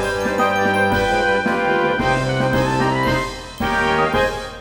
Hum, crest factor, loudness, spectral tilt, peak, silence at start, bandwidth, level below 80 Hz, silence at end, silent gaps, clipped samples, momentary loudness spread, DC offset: none; 14 dB; -18 LUFS; -5 dB/octave; -4 dBFS; 0 s; over 20 kHz; -36 dBFS; 0 s; none; under 0.1%; 4 LU; under 0.1%